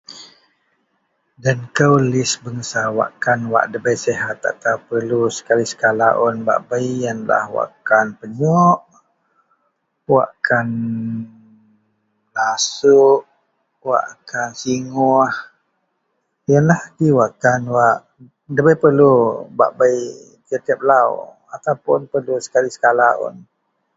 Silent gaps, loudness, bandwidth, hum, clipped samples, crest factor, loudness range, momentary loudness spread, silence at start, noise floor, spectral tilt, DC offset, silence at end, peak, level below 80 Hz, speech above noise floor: none; -17 LUFS; 8 kHz; none; under 0.1%; 18 dB; 4 LU; 11 LU; 0.1 s; -70 dBFS; -5.5 dB/octave; under 0.1%; 0.55 s; 0 dBFS; -60 dBFS; 54 dB